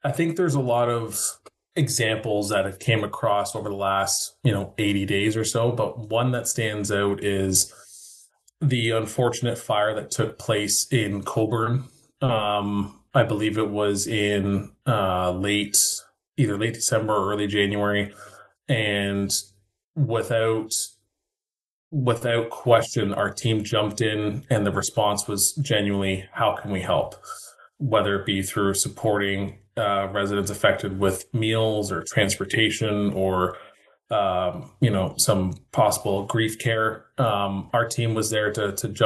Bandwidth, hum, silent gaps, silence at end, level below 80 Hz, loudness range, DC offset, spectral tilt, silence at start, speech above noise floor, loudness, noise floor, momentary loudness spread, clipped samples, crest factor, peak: 12.5 kHz; none; 19.84-19.94 s, 21.70-21.91 s; 0 s; -58 dBFS; 2 LU; under 0.1%; -4 dB/octave; 0.05 s; over 67 dB; -24 LUFS; under -90 dBFS; 6 LU; under 0.1%; 20 dB; -4 dBFS